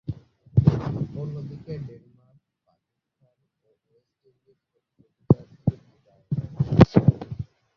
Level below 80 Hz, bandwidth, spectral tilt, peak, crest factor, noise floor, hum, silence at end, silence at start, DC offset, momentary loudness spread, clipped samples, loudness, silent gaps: -44 dBFS; 6.6 kHz; -10 dB/octave; 0 dBFS; 24 dB; -76 dBFS; none; 0.35 s; 0.1 s; under 0.1%; 20 LU; under 0.1%; -23 LUFS; none